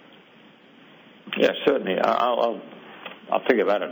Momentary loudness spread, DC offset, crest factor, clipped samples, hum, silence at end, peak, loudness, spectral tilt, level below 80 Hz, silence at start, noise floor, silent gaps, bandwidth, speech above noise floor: 19 LU; under 0.1%; 20 dB; under 0.1%; none; 0 s; -4 dBFS; -23 LUFS; -5.5 dB/octave; -74 dBFS; 1.25 s; -52 dBFS; none; over 20 kHz; 30 dB